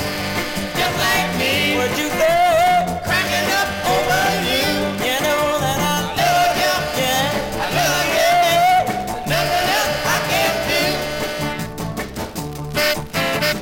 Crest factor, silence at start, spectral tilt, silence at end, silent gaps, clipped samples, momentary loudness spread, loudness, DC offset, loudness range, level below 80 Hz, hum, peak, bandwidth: 14 dB; 0 s; -3 dB/octave; 0 s; none; under 0.1%; 8 LU; -18 LUFS; under 0.1%; 3 LU; -42 dBFS; none; -4 dBFS; 17 kHz